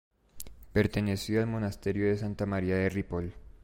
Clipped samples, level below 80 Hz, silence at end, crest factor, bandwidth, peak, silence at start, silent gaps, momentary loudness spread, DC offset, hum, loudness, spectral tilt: under 0.1%; -48 dBFS; 0.1 s; 18 dB; 16.5 kHz; -14 dBFS; 0.35 s; none; 13 LU; under 0.1%; none; -31 LUFS; -7 dB/octave